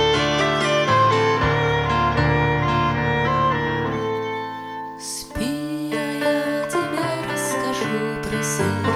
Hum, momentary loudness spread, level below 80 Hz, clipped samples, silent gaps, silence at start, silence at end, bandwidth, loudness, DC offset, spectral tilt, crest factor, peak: none; 9 LU; -40 dBFS; under 0.1%; none; 0 s; 0 s; 20 kHz; -21 LUFS; under 0.1%; -5 dB/octave; 14 dB; -8 dBFS